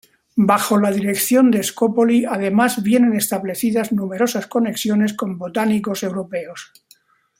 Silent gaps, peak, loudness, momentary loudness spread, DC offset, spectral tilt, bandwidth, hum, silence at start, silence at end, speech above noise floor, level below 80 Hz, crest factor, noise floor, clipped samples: none; -2 dBFS; -18 LUFS; 9 LU; under 0.1%; -5 dB/octave; 16.5 kHz; none; 0.35 s; 0.75 s; 37 dB; -62 dBFS; 16 dB; -55 dBFS; under 0.1%